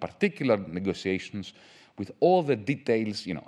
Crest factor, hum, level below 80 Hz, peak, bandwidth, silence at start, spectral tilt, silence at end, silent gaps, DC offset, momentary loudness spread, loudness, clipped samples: 18 dB; none; -66 dBFS; -10 dBFS; 11 kHz; 0 s; -6.5 dB/octave; 0.05 s; none; under 0.1%; 16 LU; -27 LUFS; under 0.1%